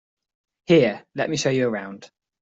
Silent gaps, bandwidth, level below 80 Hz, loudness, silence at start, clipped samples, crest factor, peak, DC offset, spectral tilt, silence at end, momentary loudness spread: none; 8.2 kHz; -62 dBFS; -22 LUFS; 0.7 s; under 0.1%; 20 dB; -4 dBFS; under 0.1%; -5.5 dB/octave; 0.35 s; 12 LU